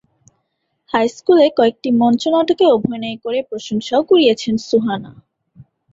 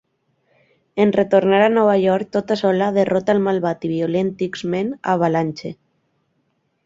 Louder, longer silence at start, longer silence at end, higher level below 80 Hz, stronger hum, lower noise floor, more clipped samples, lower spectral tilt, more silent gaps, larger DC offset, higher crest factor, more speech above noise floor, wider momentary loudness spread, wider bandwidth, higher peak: about the same, -16 LUFS vs -18 LUFS; about the same, 0.95 s vs 0.95 s; second, 0.3 s vs 1.1 s; about the same, -58 dBFS vs -60 dBFS; neither; about the same, -70 dBFS vs -68 dBFS; neither; second, -5.5 dB/octave vs -7 dB/octave; neither; neither; about the same, 14 dB vs 16 dB; first, 55 dB vs 50 dB; about the same, 10 LU vs 8 LU; about the same, 7.8 kHz vs 7.8 kHz; about the same, -2 dBFS vs -2 dBFS